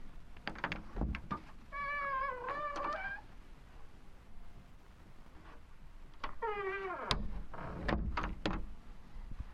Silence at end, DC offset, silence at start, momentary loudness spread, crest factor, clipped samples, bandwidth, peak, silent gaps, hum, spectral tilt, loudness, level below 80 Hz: 0 s; under 0.1%; 0 s; 22 LU; 28 dB; under 0.1%; 11 kHz; -12 dBFS; none; none; -5.5 dB/octave; -40 LUFS; -48 dBFS